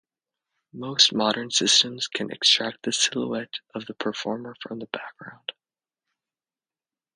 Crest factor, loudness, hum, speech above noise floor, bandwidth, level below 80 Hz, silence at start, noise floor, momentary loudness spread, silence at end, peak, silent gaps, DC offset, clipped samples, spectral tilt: 24 dB; -22 LUFS; none; over 64 dB; 10.5 kHz; -72 dBFS; 0.75 s; under -90 dBFS; 18 LU; 1.65 s; -4 dBFS; none; under 0.1%; under 0.1%; -1.5 dB/octave